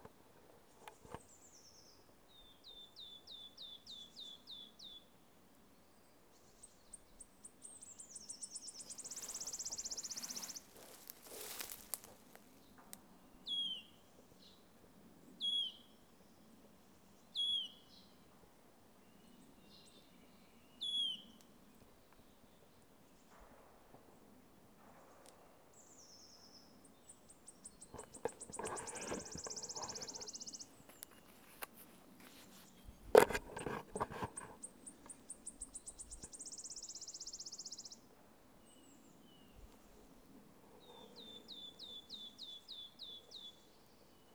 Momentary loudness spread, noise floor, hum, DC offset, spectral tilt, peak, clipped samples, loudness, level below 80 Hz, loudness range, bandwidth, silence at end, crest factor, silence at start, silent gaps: 24 LU; -68 dBFS; none; under 0.1%; -1.5 dB/octave; -8 dBFS; under 0.1%; -44 LUFS; -70 dBFS; 22 LU; over 20 kHz; 0 s; 40 dB; 0 s; none